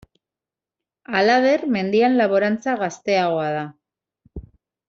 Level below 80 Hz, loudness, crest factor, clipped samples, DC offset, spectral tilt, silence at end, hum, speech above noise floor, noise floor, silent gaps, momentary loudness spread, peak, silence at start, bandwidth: -52 dBFS; -19 LUFS; 18 dB; under 0.1%; under 0.1%; -3.5 dB/octave; 0.5 s; none; 70 dB; -89 dBFS; none; 18 LU; -4 dBFS; 1.1 s; 7.6 kHz